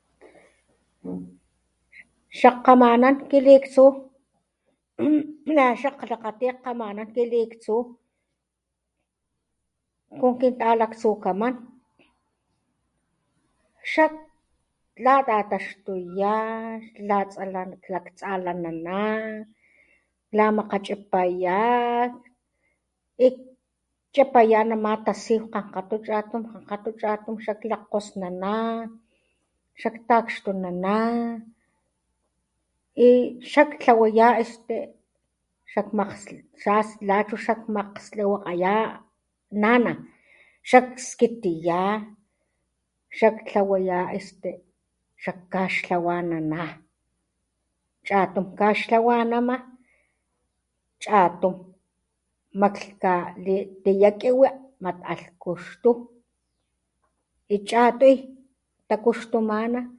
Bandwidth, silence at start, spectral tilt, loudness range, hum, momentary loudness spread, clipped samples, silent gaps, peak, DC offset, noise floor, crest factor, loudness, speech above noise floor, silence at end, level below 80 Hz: 11 kHz; 1.05 s; -6 dB/octave; 9 LU; none; 16 LU; under 0.1%; none; 0 dBFS; under 0.1%; -81 dBFS; 24 dB; -23 LUFS; 59 dB; 0.05 s; -68 dBFS